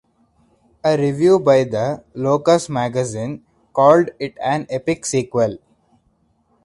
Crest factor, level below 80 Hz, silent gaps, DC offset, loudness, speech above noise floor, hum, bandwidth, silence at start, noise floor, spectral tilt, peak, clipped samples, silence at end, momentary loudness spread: 18 dB; -56 dBFS; none; under 0.1%; -18 LUFS; 45 dB; none; 11.5 kHz; 0.85 s; -62 dBFS; -6 dB/octave; 0 dBFS; under 0.1%; 1.1 s; 11 LU